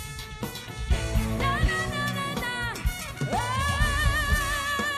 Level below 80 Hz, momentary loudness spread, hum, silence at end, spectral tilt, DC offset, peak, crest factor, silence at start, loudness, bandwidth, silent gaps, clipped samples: -32 dBFS; 11 LU; none; 0 s; -4 dB/octave; under 0.1%; -10 dBFS; 16 dB; 0 s; -27 LUFS; 14 kHz; none; under 0.1%